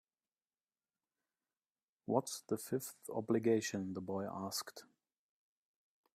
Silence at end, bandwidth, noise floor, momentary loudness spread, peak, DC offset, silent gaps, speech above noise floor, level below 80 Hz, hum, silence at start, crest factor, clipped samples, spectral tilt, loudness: 1.3 s; 15.5 kHz; under -90 dBFS; 10 LU; -18 dBFS; under 0.1%; none; over 51 dB; -82 dBFS; none; 2.1 s; 24 dB; under 0.1%; -5 dB/octave; -39 LUFS